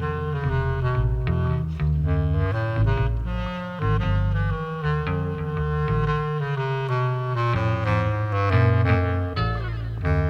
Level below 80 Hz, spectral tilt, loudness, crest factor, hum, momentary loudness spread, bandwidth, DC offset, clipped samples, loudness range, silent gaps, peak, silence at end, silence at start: -32 dBFS; -8.5 dB/octave; -24 LUFS; 14 dB; none; 6 LU; 6.4 kHz; under 0.1%; under 0.1%; 2 LU; none; -8 dBFS; 0 s; 0 s